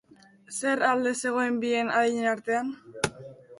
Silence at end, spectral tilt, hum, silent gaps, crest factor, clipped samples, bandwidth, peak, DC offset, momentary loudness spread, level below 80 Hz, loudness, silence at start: 0.05 s; -3.5 dB/octave; none; none; 20 dB; under 0.1%; 11.5 kHz; -8 dBFS; under 0.1%; 9 LU; -64 dBFS; -27 LUFS; 0.5 s